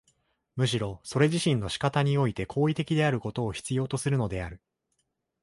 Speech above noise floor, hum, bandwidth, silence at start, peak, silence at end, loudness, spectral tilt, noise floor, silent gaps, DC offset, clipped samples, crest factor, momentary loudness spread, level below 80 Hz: 51 dB; none; 11.5 kHz; 0.55 s; -10 dBFS; 0.85 s; -28 LUFS; -6 dB/octave; -78 dBFS; none; under 0.1%; under 0.1%; 18 dB; 7 LU; -52 dBFS